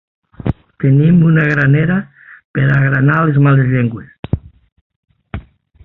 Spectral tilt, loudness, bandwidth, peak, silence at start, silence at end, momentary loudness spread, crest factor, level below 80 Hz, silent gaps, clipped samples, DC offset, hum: -10.5 dB/octave; -13 LUFS; 4 kHz; -2 dBFS; 0.45 s; 0.45 s; 20 LU; 12 dB; -38 dBFS; 2.44-2.54 s, 4.19-4.23 s, 4.72-4.90 s, 4.96-5.03 s; under 0.1%; under 0.1%; none